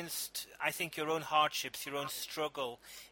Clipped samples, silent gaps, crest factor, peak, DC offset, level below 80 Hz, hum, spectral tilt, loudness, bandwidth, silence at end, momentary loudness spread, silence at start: under 0.1%; none; 22 dB; -16 dBFS; under 0.1%; -74 dBFS; none; -2 dB/octave; -36 LUFS; 17 kHz; 0.05 s; 10 LU; 0 s